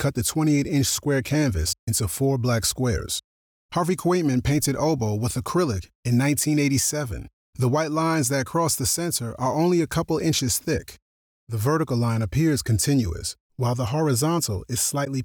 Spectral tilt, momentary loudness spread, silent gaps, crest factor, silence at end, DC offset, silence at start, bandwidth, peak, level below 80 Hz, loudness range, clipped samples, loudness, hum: -5 dB/octave; 7 LU; 1.79-1.87 s, 3.24-3.69 s, 5.95-6.03 s, 7.33-7.53 s, 11.02-11.47 s, 13.40-13.50 s; 12 dB; 0 s; under 0.1%; 0 s; over 20 kHz; -12 dBFS; -42 dBFS; 2 LU; under 0.1%; -23 LUFS; none